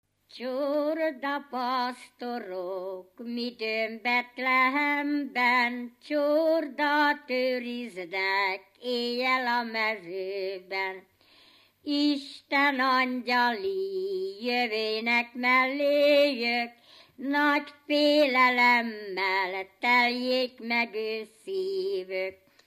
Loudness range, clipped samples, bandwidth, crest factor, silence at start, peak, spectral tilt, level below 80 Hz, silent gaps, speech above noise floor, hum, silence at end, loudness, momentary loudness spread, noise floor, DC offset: 6 LU; under 0.1%; 15 kHz; 18 dB; 0.35 s; -10 dBFS; -3.5 dB/octave; -82 dBFS; none; 32 dB; none; 0.3 s; -27 LUFS; 13 LU; -59 dBFS; under 0.1%